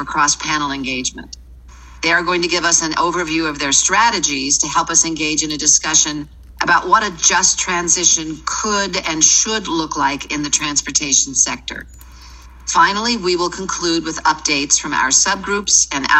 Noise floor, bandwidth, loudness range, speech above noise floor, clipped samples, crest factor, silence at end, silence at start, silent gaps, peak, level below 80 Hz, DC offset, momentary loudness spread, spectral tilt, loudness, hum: -39 dBFS; 14 kHz; 4 LU; 22 dB; under 0.1%; 18 dB; 0 s; 0 s; none; 0 dBFS; -42 dBFS; under 0.1%; 9 LU; -0.5 dB/octave; -15 LUFS; none